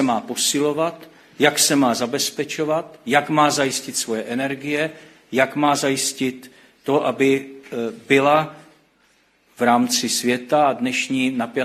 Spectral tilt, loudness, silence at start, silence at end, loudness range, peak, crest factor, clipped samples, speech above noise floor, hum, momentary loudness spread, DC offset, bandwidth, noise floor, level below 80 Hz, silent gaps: -3 dB/octave; -20 LUFS; 0 s; 0 s; 2 LU; 0 dBFS; 20 dB; under 0.1%; 40 dB; none; 10 LU; under 0.1%; 15 kHz; -60 dBFS; -66 dBFS; none